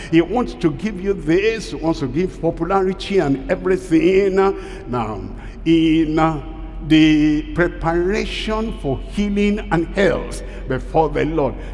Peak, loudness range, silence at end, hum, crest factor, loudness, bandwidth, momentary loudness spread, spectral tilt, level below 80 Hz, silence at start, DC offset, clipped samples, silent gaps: -4 dBFS; 3 LU; 0 s; none; 14 dB; -18 LUFS; 11.5 kHz; 11 LU; -6.5 dB/octave; -32 dBFS; 0 s; under 0.1%; under 0.1%; none